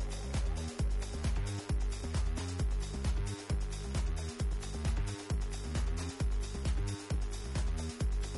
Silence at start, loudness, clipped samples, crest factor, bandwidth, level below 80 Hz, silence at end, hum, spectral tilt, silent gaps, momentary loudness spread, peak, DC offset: 0 s; -37 LUFS; under 0.1%; 12 dB; 11.5 kHz; -36 dBFS; 0 s; none; -5.5 dB/octave; none; 2 LU; -24 dBFS; under 0.1%